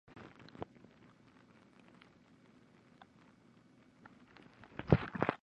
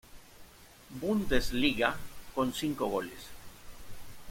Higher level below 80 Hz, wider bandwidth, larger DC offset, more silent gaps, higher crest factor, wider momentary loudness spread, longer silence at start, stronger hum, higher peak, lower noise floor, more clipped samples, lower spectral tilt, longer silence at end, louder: second, -58 dBFS vs -46 dBFS; second, 7 kHz vs 16.5 kHz; neither; neither; first, 32 dB vs 24 dB; first, 30 LU vs 23 LU; about the same, 0.15 s vs 0.1 s; neither; about the same, -10 dBFS vs -10 dBFS; first, -65 dBFS vs -54 dBFS; neither; first, -9 dB/octave vs -4.5 dB/octave; about the same, 0.05 s vs 0 s; second, -37 LUFS vs -32 LUFS